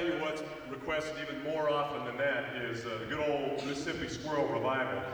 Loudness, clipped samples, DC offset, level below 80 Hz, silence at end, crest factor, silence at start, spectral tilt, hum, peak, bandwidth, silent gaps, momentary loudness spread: -34 LUFS; under 0.1%; under 0.1%; -62 dBFS; 0 s; 14 dB; 0 s; -5 dB/octave; none; -20 dBFS; over 20 kHz; none; 6 LU